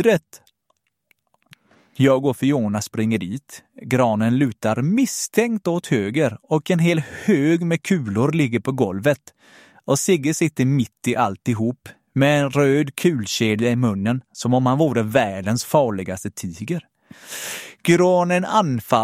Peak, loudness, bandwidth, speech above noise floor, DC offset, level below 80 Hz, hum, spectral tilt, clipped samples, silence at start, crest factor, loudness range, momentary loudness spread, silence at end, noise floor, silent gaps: -2 dBFS; -20 LUFS; 16.5 kHz; 50 dB; under 0.1%; -60 dBFS; none; -5.5 dB/octave; under 0.1%; 0 s; 18 dB; 2 LU; 11 LU; 0 s; -70 dBFS; none